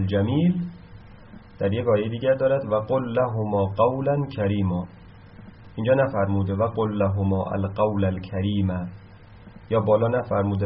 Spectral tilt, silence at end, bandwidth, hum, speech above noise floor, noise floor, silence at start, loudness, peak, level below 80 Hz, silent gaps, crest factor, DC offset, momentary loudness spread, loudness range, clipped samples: -7.5 dB/octave; 0 s; 5.2 kHz; none; 23 dB; -46 dBFS; 0 s; -24 LUFS; -6 dBFS; -52 dBFS; none; 18 dB; under 0.1%; 7 LU; 2 LU; under 0.1%